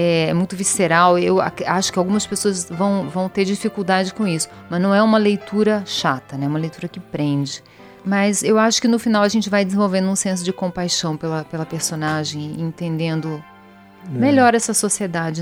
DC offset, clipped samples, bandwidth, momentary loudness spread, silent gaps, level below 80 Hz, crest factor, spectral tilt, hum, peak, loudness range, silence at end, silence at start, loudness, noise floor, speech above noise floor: under 0.1%; under 0.1%; 15.5 kHz; 11 LU; none; -56 dBFS; 18 dB; -4.5 dB/octave; none; -2 dBFS; 4 LU; 0 s; 0 s; -19 LUFS; -45 dBFS; 26 dB